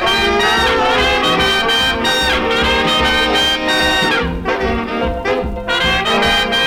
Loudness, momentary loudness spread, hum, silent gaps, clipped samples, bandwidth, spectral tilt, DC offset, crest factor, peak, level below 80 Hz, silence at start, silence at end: -13 LUFS; 6 LU; none; none; under 0.1%; 19.5 kHz; -3 dB/octave; under 0.1%; 10 dB; -4 dBFS; -28 dBFS; 0 s; 0 s